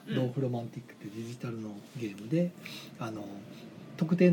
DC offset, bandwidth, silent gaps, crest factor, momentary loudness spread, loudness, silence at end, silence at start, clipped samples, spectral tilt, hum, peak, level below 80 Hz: under 0.1%; 18 kHz; none; 22 dB; 14 LU; -35 LUFS; 0 s; 0 s; under 0.1%; -7.5 dB/octave; none; -12 dBFS; -76 dBFS